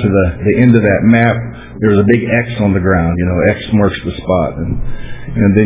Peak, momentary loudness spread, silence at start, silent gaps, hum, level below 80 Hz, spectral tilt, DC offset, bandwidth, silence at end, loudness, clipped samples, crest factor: 0 dBFS; 12 LU; 0 s; none; none; -28 dBFS; -12 dB/octave; under 0.1%; 3.8 kHz; 0 s; -12 LUFS; 0.1%; 12 dB